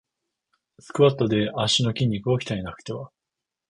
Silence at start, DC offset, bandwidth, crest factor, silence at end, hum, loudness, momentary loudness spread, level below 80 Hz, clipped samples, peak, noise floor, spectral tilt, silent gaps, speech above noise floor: 0.95 s; under 0.1%; 11 kHz; 20 dB; 0.6 s; none; -23 LUFS; 15 LU; -54 dBFS; under 0.1%; -6 dBFS; -86 dBFS; -5.5 dB/octave; none; 63 dB